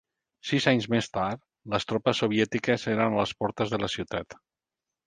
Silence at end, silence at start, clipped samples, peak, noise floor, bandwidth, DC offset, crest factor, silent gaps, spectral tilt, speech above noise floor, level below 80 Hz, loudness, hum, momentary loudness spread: 0.75 s; 0.45 s; under 0.1%; -8 dBFS; -89 dBFS; 9.6 kHz; under 0.1%; 20 dB; none; -5.5 dB/octave; 62 dB; -58 dBFS; -27 LUFS; none; 10 LU